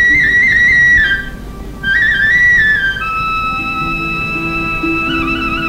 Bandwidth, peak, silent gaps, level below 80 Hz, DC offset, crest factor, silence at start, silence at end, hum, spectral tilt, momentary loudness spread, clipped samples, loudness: 16 kHz; -2 dBFS; none; -30 dBFS; under 0.1%; 10 dB; 0 s; 0 s; none; -4 dB/octave; 9 LU; under 0.1%; -11 LUFS